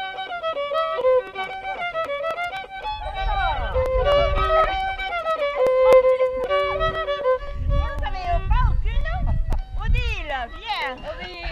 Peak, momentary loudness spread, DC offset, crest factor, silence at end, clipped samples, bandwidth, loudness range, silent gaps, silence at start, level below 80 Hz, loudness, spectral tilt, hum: -6 dBFS; 10 LU; under 0.1%; 16 dB; 0 s; under 0.1%; 9.8 kHz; 6 LU; none; 0 s; -28 dBFS; -23 LUFS; -6 dB/octave; none